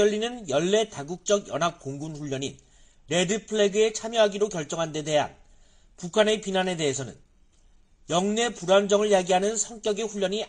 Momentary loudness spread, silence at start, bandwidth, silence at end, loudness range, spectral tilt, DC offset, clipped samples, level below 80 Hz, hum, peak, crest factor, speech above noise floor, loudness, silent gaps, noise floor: 11 LU; 0 s; 10 kHz; 0 s; 3 LU; -3.5 dB/octave; under 0.1%; under 0.1%; -58 dBFS; none; -8 dBFS; 18 dB; 33 dB; -25 LUFS; none; -58 dBFS